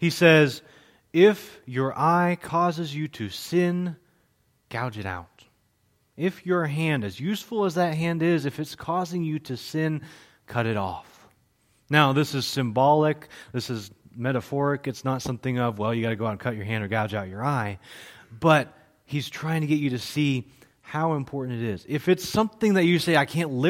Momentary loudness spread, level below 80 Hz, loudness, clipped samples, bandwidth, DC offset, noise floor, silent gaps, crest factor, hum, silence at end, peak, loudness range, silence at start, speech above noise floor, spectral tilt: 13 LU; -62 dBFS; -25 LUFS; under 0.1%; 16.5 kHz; under 0.1%; -67 dBFS; none; 22 dB; none; 0 s; -2 dBFS; 6 LU; 0 s; 43 dB; -6 dB/octave